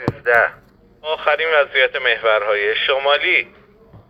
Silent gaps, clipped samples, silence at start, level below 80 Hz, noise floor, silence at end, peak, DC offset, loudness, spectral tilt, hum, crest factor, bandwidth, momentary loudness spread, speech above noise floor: none; under 0.1%; 0 s; -54 dBFS; -46 dBFS; 0.1 s; 0 dBFS; under 0.1%; -16 LUFS; -5 dB/octave; none; 18 dB; 12 kHz; 7 LU; 29 dB